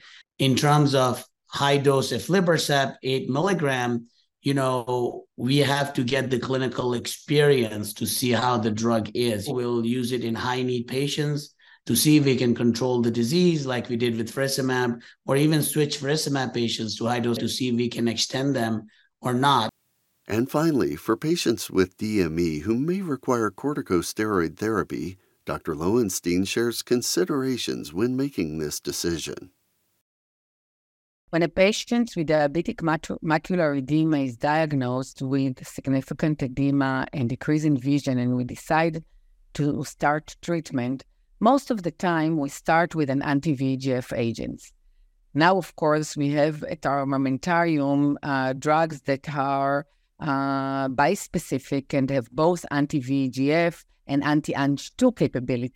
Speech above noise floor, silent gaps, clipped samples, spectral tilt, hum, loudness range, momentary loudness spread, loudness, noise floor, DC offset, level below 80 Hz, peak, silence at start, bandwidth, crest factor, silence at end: 47 dB; 30.01-31.28 s; under 0.1%; -5.5 dB/octave; none; 3 LU; 8 LU; -24 LUFS; -71 dBFS; under 0.1%; -56 dBFS; -6 dBFS; 0.4 s; 17 kHz; 18 dB; 0.05 s